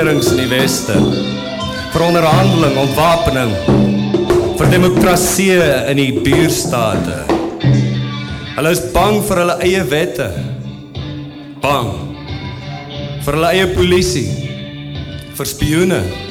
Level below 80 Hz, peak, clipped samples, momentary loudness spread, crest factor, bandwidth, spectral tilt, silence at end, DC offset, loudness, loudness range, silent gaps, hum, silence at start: -32 dBFS; 0 dBFS; under 0.1%; 15 LU; 14 dB; 17.5 kHz; -5 dB/octave; 0 s; under 0.1%; -14 LUFS; 6 LU; none; none; 0 s